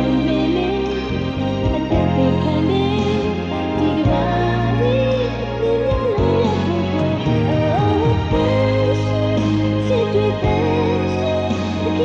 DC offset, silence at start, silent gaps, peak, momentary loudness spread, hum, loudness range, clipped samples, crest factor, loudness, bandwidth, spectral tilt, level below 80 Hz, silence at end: under 0.1%; 0 s; none; -4 dBFS; 4 LU; none; 1 LU; under 0.1%; 12 dB; -18 LUFS; 7.8 kHz; -8 dB/octave; -32 dBFS; 0 s